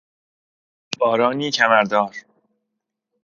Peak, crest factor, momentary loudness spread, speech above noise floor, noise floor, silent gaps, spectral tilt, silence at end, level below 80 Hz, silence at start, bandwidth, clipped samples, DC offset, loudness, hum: 0 dBFS; 22 dB; 14 LU; 62 dB; -80 dBFS; none; -3.5 dB/octave; 1.05 s; -70 dBFS; 0.9 s; 7.4 kHz; under 0.1%; under 0.1%; -18 LUFS; none